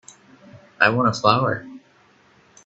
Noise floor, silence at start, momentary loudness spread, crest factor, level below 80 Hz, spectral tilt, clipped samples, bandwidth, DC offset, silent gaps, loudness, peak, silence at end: -56 dBFS; 0.55 s; 7 LU; 22 dB; -60 dBFS; -5.5 dB/octave; under 0.1%; 8.2 kHz; under 0.1%; none; -19 LUFS; 0 dBFS; 0.9 s